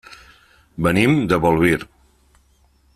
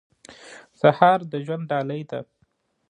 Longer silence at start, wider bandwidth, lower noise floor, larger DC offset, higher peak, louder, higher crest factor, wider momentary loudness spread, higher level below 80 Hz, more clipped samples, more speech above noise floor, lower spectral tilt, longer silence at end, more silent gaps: first, 0.8 s vs 0.3 s; first, 15 kHz vs 10 kHz; second, -57 dBFS vs -67 dBFS; neither; about the same, -2 dBFS vs -2 dBFS; first, -17 LUFS vs -22 LUFS; about the same, 18 dB vs 22 dB; second, 17 LU vs 20 LU; first, -44 dBFS vs -70 dBFS; neither; second, 41 dB vs 46 dB; about the same, -6.5 dB/octave vs -7 dB/octave; first, 1.1 s vs 0.65 s; neither